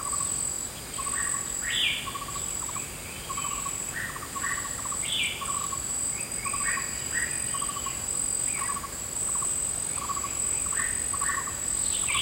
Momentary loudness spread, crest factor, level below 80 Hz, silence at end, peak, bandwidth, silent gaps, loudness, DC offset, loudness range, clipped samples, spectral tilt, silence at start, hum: 6 LU; 18 dB; -50 dBFS; 0 s; -12 dBFS; 16 kHz; none; -28 LUFS; under 0.1%; 3 LU; under 0.1%; -0.5 dB/octave; 0 s; none